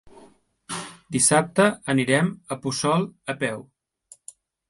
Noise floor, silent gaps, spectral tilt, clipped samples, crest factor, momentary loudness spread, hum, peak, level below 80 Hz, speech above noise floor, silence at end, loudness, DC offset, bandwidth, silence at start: -55 dBFS; none; -4 dB/octave; under 0.1%; 20 dB; 18 LU; none; -4 dBFS; -62 dBFS; 32 dB; 1.1 s; -23 LUFS; under 0.1%; 11.5 kHz; 0.05 s